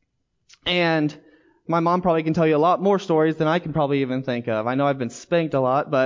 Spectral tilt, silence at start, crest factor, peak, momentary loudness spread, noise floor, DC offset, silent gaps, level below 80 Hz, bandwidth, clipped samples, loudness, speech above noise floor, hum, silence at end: -6.5 dB/octave; 0.65 s; 14 dB; -8 dBFS; 6 LU; -69 dBFS; under 0.1%; none; -56 dBFS; 7.6 kHz; under 0.1%; -21 LUFS; 48 dB; none; 0 s